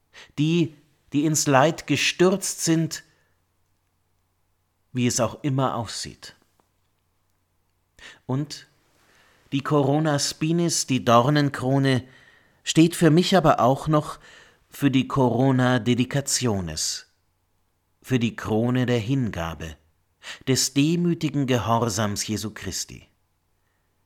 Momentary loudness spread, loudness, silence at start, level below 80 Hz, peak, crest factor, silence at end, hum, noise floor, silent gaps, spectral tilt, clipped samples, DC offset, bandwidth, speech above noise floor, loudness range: 14 LU; -22 LUFS; 0.15 s; -54 dBFS; -2 dBFS; 22 dB; 1.1 s; none; -69 dBFS; none; -5 dB/octave; under 0.1%; under 0.1%; 18.5 kHz; 47 dB; 8 LU